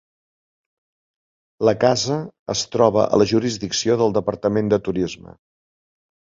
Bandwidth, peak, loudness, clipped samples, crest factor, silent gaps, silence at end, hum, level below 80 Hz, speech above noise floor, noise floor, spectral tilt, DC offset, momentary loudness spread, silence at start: 7.8 kHz; -2 dBFS; -20 LUFS; under 0.1%; 20 dB; 2.39-2.46 s; 1.25 s; none; -52 dBFS; over 71 dB; under -90 dBFS; -5 dB/octave; under 0.1%; 8 LU; 1.6 s